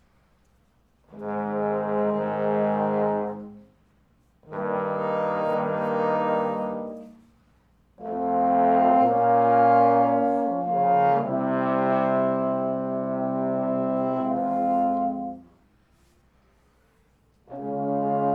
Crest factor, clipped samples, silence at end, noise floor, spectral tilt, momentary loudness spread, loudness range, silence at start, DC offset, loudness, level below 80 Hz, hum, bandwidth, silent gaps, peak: 16 dB; under 0.1%; 0 s; -63 dBFS; -9.5 dB/octave; 14 LU; 7 LU; 1.1 s; under 0.1%; -24 LUFS; -66 dBFS; none; 4.8 kHz; none; -8 dBFS